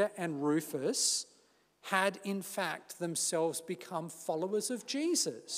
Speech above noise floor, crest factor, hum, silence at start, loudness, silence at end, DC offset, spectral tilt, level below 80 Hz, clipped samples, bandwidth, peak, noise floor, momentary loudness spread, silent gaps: 34 dB; 20 dB; none; 0 s; -34 LUFS; 0 s; under 0.1%; -3 dB/octave; -90 dBFS; under 0.1%; 16 kHz; -14 dBFS; -69 dBFS; 9 LU; none